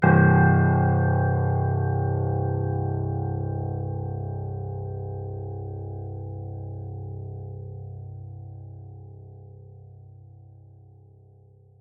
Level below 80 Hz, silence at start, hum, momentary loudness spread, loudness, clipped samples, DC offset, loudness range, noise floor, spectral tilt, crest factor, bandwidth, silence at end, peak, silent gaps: -50 dBFS; 0 s; none; 23 LU; -25 LUFS; under 0.1%; under 0.1%; 20 LU; -53 dBFS; -13.5 dB/octave; 20 dB; 2.8 kHz; 1.65 s; -6 dBFS; none